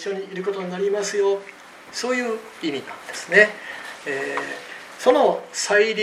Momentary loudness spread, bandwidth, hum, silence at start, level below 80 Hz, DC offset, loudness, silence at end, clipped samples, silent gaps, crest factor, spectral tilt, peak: 16 LU; 14.5 kHz; none; 0 s; -74 dBFS; under 0.1%; -22 LUFS; 0 s; under 0.1%; none; 22 dB; -3 dB/octave; 0 dBFS